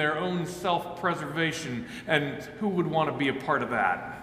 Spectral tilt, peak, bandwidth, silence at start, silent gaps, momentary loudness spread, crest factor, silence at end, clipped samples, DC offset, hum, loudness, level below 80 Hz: -5 dB/octave; -8 dBFS; 15.5 kHz; 0 s; none; 6 LU; 20 dB; 0 s; under 0.1%; under 0.1%; none; -28 LUFS; -60 dBFS